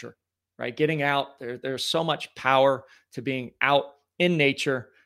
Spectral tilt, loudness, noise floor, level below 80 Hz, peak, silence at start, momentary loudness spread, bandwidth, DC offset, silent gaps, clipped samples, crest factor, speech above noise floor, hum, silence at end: -5 dB/octave; -25 LUFS; -52 dBFS; -72 dBFS; -6 dBFS; 0 s; 14 LU; 16 kHz; under 0.1%; none; under 0.1%; 22 dB; 27 dB; none; 0.2 s